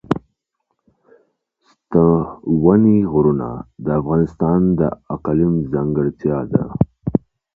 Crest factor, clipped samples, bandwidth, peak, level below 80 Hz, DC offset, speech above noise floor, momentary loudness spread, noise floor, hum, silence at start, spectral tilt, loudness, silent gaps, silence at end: 18 dB; under 0.1%; 4.1 kHz; 0 dBFS; -40 dBFS; under 0.1%; 57 dB; 9 LU; -73 dBFS; none; 0.1 s; -12 dB/octave; -18 LUFS; none; 0.4 s